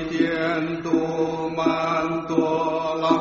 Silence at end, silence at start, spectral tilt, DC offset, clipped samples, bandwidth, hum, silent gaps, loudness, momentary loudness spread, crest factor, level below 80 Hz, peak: 0 s; 0 s; -4.5 dB/octave; under 0.1%; under 0.1%; 7.4 kHz; none; none; -23 LUFS; 3 LU; 18 dB; -54 dBFS; -6 dBFS